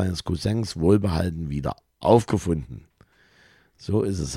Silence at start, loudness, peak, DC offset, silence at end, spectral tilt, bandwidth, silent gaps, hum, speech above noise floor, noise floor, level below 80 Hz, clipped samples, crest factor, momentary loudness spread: 0 s; -24 LUFS; -4 dBFS; under 0.1%; 0 s; -7 dB/octave; 14 kHz; none; none; 35 dB; -58 dBFS; -42 dBFS; under 0.1%; 20 dB; 12 LU